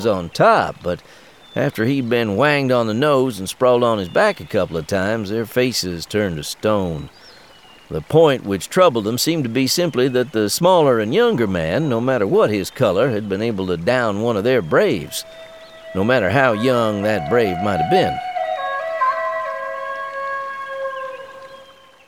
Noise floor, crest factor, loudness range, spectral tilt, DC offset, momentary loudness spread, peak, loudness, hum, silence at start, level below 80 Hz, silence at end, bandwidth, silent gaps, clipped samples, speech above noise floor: -46 dBFS; 16 dB; 5 LU; -5 dB/octave; 0.2%; 12 LU; -2 dBFS; -18 LUFS; none; 0 s; -50 dBFS; 0.45 s; 19.5 kHz; none; under 0.1%; 28 dB